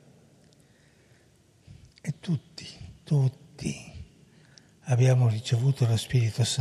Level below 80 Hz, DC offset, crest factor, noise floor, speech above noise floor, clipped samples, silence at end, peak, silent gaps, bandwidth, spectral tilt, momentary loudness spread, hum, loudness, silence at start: -58 dBFS; under 0.1%; 18 dB; -61 dBFS; 36 dB; under 0.1%; 0 s; -12 dBFS; none; 12.5 kHz; -6 dB/octave; 21 LU; none; -27 LUFS; 2.05 s